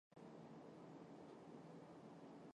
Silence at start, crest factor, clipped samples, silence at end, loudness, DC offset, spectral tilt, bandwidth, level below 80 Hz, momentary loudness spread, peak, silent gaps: 0.1 s; 14 dB; under 0.1%; 0 s; -60 LUFS; under 0.1%; -7 dB/octave; 10 kHz; under -90 dBFS; 1 LU; -46 dBFS; none